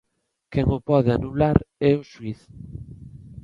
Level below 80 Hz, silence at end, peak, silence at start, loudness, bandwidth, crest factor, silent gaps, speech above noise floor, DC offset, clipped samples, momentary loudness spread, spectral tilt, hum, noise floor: -38 dBFS; 0.05 s; -2 dBFS; 0.5 s; -22 LUFS; 6.8 kHz; 22 dB; none; 32 dB; under 0.1%; under 0.1%; 21 LU; -9.5 dB/octave; none; -53 dBFS